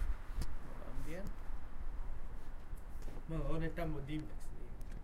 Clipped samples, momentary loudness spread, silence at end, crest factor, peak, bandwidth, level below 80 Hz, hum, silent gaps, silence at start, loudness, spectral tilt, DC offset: under 0.1%; 11 LU; 0 s; 14 dB; -24 dBFS; 12 kHz; -42 dBFS; none; none; 0 s; -47 LUFS; -7 dB/octave; under 0.1%